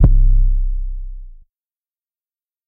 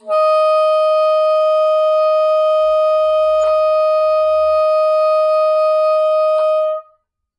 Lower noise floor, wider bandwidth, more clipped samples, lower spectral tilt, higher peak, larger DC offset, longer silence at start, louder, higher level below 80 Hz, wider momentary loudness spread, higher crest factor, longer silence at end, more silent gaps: first, under -90 dBFS vs -59 dBFS; second, 1.4 kHz vs 9.8 kHz; neither; first, -13 dB/octave vs -1.5 dB/octave; first, 0 dBFS vs -8 dBFS; neither; about the same, 0 s vs 0.05 s; second, -20 LUFS vs -14 LUFS; first, -16 dBFS vs -56 dBFS; first, 20 LU vs 1 LU; first, 16 dB vs 6 dB; first, 1.4 s vs 0.55 s; neither